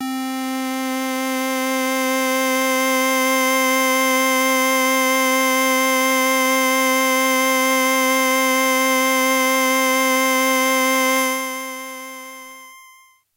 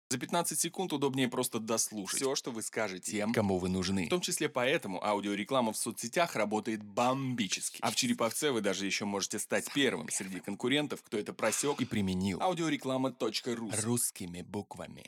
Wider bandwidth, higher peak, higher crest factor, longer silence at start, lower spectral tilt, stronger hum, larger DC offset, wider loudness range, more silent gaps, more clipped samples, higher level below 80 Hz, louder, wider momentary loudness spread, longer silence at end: second, 16 kHz vs 18.5 kHz; first, -4 dBFS vs -16 dBFS; about the same, 14 dB vs 18 dB; about the same, 0 s vs 0.1 s; second, 0 dB/octave vs -3.5 dB/octave; neither; neither; about the same, 3 LU vs 1 LU; neither; neither; second, -88 dBFS vs -72 dBFS; first, -17 LUFS vs -33 LUFS; first, 8 LU vs 5 LU; first, 0.55 s vs 0.05 s